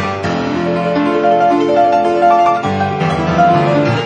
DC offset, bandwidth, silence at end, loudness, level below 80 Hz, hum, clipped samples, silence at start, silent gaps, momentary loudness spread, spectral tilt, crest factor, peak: under 0.1%; 9 kHz; 0 s; -13 LUFS; -44 dBFS; none; under 0.1%; 0 s; none; 6 LU; -7 dB/octave; 12 dB; 0 dBFS